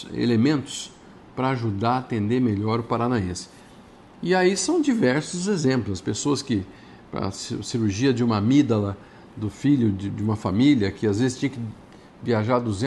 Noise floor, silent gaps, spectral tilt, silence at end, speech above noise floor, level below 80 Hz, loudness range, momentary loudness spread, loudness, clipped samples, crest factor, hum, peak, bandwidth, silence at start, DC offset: -48 dBFS; none; -6 dB/octave; 0 s; 25 dB; -56 dBFS; 3 LU; 14 LU; -23 LUFS; under 0.1%; 16 dB; none; -8 dBFS; 11.5 kHz; 0 s; under 0.1%